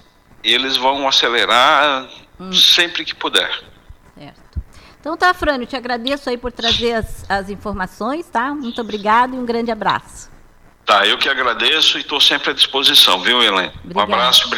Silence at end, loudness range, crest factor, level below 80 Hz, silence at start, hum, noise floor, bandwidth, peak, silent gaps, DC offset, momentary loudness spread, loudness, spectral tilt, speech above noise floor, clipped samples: 0 s; 8 LU; 14 dB; -40 dBFS; 0.45 s; none; -46 dBFS; 19 kHz; -2 dBFS; none; under 0.1%; 14 LU; -14 LUFS; -2 dB/octave; 30 dB; under 0.1%